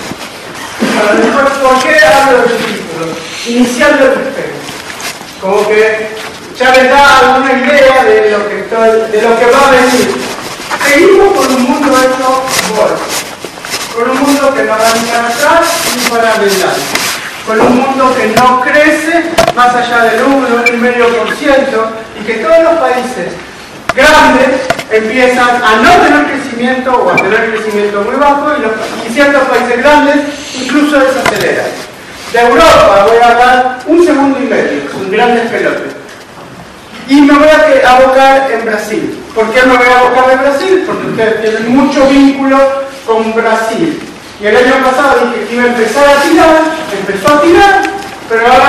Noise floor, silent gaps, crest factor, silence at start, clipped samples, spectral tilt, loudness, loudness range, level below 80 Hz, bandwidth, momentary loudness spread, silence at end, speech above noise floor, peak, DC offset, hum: -29 dBFS; none; 8 dB; 0 s; 2%; -3.5 dB/octave; -7 LUFS; 4 LU; -38 dBFS; 14 kHz; 13 LU; 0 s; 22 dB; 0 dBFS; under 0.1%; none